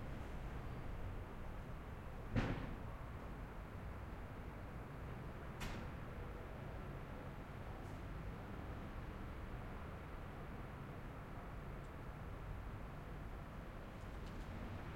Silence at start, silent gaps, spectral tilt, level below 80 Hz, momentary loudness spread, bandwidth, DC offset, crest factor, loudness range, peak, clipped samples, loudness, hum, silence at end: 0 s; none; -7 dB/octave; -52 dBFS; 4 LU; 16 kHz; under 0.1%; 24 dB; 3 LU; -26 dBFS; under 0.1%; -50 LUFS; none; 0 s